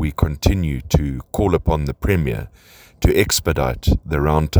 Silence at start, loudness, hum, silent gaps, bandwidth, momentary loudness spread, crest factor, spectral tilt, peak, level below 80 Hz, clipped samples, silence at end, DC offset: 0 s; -19 LUFS; none; none; over 20 kHz; 5 LU; 18 dB; -5.5 dB/octave; 0 dBFS; -24 dBFS; under 0.1%; 0 s; under 0.1%